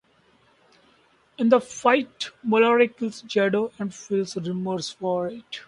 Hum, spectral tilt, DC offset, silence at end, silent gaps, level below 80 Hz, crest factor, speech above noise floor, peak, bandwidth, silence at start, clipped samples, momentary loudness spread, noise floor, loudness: none; -5 dB/octave; under 0.1%; 0.05 s; none; -68 dBFS; 20 dB; 38 dB; -4 dBFS; 11 kHz; 1.4 s; under 0.1%; 12 LU; -61 dBFS; -24 LUFS